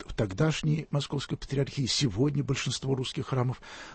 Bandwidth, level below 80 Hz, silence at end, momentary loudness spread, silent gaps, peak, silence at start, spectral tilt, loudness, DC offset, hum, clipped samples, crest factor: 8.8 kHz; -50 dBFS; 0 s; 6 LU; none; -14 dBFS; 0 s; -5 dB/octave; -30 LUFS; under 0.1%; none; under 0.1%; 16 dB